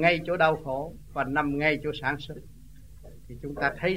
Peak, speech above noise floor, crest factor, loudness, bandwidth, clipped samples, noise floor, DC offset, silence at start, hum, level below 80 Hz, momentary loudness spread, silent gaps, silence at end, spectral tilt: -8 dBFS; 22 dB; 20 dB; -27 LUFS; 16 kHz; under 0.1%; -49 dBFS; 0.3%; 0 s; none; -50 dBFS; 17 LU; none; 0 s; -6.5 dB/octave